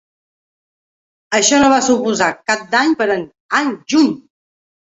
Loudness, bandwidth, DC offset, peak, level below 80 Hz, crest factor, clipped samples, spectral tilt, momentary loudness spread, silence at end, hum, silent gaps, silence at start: -15 LUFS; 8.4 kHz; under 0.1%; 0 dBFS; -54 dBFS; 16 dB; under 0.1%; -2.5 dB/octave; 8 LU; 0.8 s; none; 3.40-3.49 s; 1.3 s